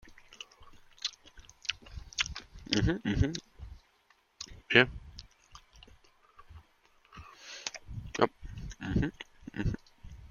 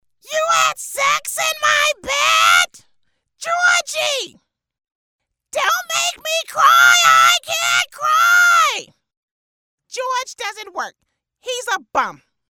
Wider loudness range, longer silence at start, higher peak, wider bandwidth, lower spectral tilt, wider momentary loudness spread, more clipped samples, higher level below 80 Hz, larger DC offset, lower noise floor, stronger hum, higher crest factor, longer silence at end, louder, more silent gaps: about the same, 8 LU vs 9 LU; second, 0.05 s vs 0.3 s; second, -6 dBFS vs -2 dBFS; second, 7.4 kHz vs 19 kHz; first, -4.5 dB/octave vs 1.5 dB/octave; first, 23 LU vs 17 LU; neither; first, -48 dBFS vs -62 dBFS; neither; second, -69 dBFS vs -73 dBFS; neither; first, 30 dB vs 16 dB; second, 0 s vs 0.35 s; second, -32 LUFS vs -15 LUFS; second, none vs 4.95-5.19 s, 9.17-9.78 s